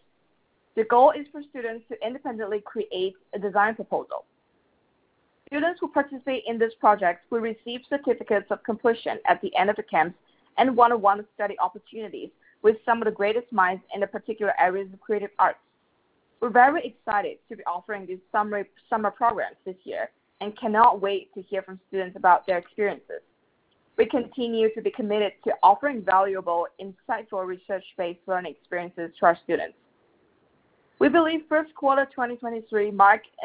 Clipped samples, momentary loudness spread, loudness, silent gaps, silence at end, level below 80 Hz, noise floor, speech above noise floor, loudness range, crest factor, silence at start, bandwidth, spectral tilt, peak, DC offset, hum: under 0.1%; 15 LU; -25 LUFS; none; 0 s; -68 dBFS; -69 dBFS; 44 dB; 5 LU; 22 dB; 0.75 s; 4 kHz; -8.5 dB/octave; -4 dBFS; under 0.1%; none